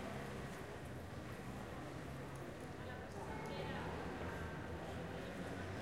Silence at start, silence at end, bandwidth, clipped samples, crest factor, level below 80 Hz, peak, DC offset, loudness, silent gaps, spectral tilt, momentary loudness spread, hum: 0 s; 0 s; 16 kHz; under 0.1%; 14 dB; -60 dBFS; -34 dBFS; under 0.1%; -48 LUFS; none; -6 dB/octave; 5 LU; none